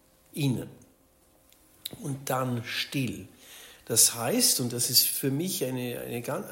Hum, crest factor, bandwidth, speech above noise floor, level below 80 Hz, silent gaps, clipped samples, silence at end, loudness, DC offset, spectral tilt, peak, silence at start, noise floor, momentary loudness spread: none; 24 dB; 16.5 kHz; 35 dB; -66 dBFS; none; under 0.1%; 0 s; -26 LUFS; under 0.1%; -3 dB/octave; -6 dBFS; 0.35 s; -63 dBFS; 21 LU